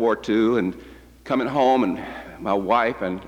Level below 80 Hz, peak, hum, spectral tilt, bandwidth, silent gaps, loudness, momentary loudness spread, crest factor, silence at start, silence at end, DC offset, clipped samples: -52 dBFS; -6 dBFS; none; -6.5 dB/octave; 15 kHz; none; -22 LUFS; 12 LU; 16 dB; 0 s; 0 s; under 0.1%; under 0.1%